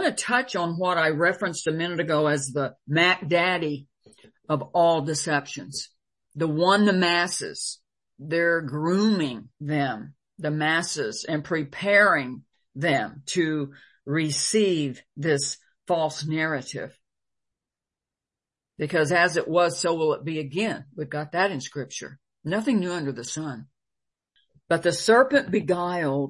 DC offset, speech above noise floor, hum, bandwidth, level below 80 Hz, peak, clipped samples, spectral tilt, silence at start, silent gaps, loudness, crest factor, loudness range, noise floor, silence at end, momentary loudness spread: under 0.1%; over 66 dB; none; 11.5 kHz; -70 dBFS; -6 dBFS; under 0.1%; -4.5 dB/octave; 0 s; none; -24 LUFS; 20 dB; 5 LU; under -90 dBFS; 0 s; 14 LU